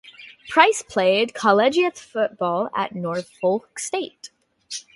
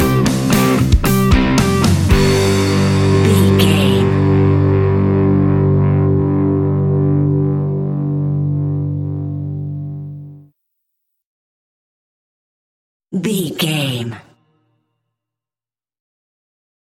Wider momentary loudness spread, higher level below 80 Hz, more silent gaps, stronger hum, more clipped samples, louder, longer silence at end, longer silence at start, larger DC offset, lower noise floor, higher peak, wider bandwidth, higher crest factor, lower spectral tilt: about the same, 12 LU vs 11 LU; second, -66 dBFS vs -28 dBFS; second, none vs 11.26-13.00 s; neither; neither; second, -21 LUFS vs -14 LUFS; second, 0.15 s vs 2.65 s; about the same, 0.05 s vs 0 s; neither; second, -40 dBFS vs under -90 dBFS; about the same, 0 dBFS vs 0 dBFS; second, 11.5 kHz vs 17 kHz; first, 22 dB vs 16 dB; second, -3.5 dB/octave vs -6.5 dB/octave